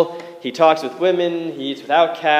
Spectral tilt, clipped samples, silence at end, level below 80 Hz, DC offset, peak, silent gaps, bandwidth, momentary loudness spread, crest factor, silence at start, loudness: -5 dB/octave; under 0.1%; 0 s; -82 dBFS; under 0.1%; 0 dBFS; none; 14.5 kHz; 11 LU; 18 dB; 0 s; -18 LUFS